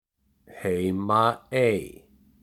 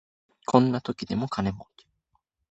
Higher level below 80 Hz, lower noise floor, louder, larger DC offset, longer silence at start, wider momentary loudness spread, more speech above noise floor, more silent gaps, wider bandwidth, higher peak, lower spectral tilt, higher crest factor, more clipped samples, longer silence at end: about the same, -60 dBFS vs -56 dBFS; second, -57 dBFS vs -75 dBFS; about the same, -25 LUFS vs -26 LUFS; neither; about the same, 0.5 s vs 0.5 s; second, 10 LU vs 14 LU; second, 33 dB vs 49 dB; neither; first, 16 kHz vs 8.2 kHz; second, -6 dBFS vs -2 dBFS; about the same, -6.5 dB/octave vs -7 dB/octave; second, 20 dB vs 26 dB; neither; second, 0.5 s vs 0.85 s